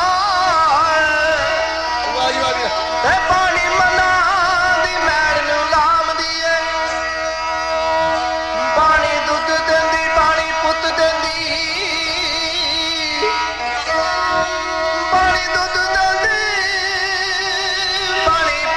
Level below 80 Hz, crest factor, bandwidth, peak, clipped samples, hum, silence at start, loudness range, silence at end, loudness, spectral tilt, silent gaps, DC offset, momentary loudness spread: -40 dBFS; 12 dB; 12.5 kHz; -4 dBFS; under 0.1%; none; 0 s; 3 LU; 0 s; -16 LUFS; -2 dB/octave; none; under 0.1%; 5 LU